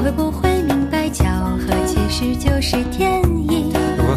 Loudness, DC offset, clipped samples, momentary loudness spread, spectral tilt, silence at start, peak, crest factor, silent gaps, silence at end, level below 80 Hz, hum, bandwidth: -18 LUFS; under 0.1%; under 0.1%; 2 LU; -6 dB/octave; 0 s; 0 dBFS; 16 dB; none; 0 s; -24 dBFS; none; 14 kHz